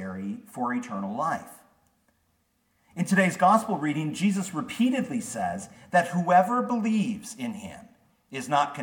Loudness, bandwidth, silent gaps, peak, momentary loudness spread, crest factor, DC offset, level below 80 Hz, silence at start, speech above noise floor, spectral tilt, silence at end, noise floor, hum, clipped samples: -26 LUFS; 18 kHz; none; -10 dBFS; 14 LU; 18 dB; under 0.1%; -70 dBFS; 0 s; 45 dB; -5.5 dB/octave; 0 s; -71 dBFS; none; under 0.1%